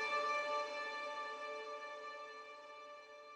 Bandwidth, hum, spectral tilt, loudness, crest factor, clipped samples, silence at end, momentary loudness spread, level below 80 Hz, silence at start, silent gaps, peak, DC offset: 10.5 kHz; none; -0.5 dB/octave; -43 LUFS; 16 dB; under 0.1%; 0 s; 16 LU; under -90 dBFS; 0 s; none; -28 dBFS; under 0.1%